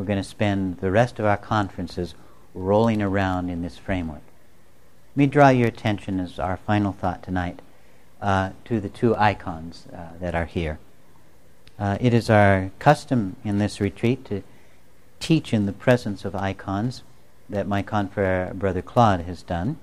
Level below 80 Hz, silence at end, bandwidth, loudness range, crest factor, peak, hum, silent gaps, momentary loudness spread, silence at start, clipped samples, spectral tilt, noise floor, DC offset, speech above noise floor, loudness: -46 dBFS; 0.05 s; 13 kHz; 4 LU; 20 dB; -2 dBFS; none; none; 13 LU; 0 s; under 0.1%; -7 dB/octave; -56 dBFS; 0.7%; 34 dB; -23 LUFS